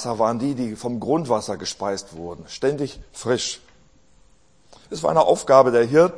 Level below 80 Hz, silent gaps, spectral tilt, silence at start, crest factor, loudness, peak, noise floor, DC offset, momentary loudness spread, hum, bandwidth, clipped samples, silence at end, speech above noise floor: -54 dBFS; none; -5 dB/octave; 0 s; 22 dB; -21 LUFS; 0 dBFS; -58 dBFS; 0.2%; 17 LU; none; 10.5 kHz; under 0.1%; 0 s; 37 dB